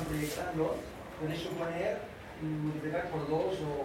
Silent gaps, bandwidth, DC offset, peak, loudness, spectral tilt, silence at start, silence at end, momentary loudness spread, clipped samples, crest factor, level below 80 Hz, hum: none; 16.5 kHz; under 0.1%; -20 dBFS; -36 LUFS; -6 dB/octave; 0 s; 0 s; 8 LU; under 0.1%; 16 dB; -56 dBFS; none